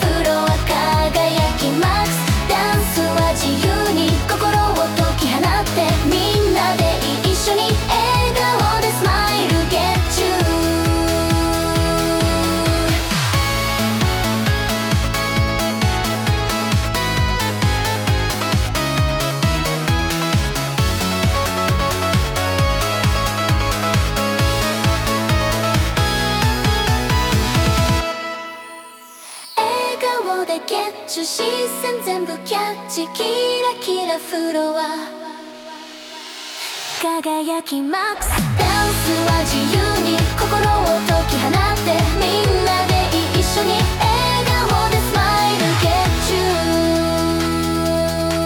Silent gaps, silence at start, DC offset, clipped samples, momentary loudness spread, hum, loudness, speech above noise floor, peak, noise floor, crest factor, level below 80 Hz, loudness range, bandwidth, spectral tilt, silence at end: none; 0 s; under 0.1%; under 0.1%; 6 LU; none; -18 LUFS; 20 dB; -4 dBFS; -38 dBFS; 14 dB; -28 dBFS; 5 LU; 18 kHz; -4.5 dB/octave; 0 s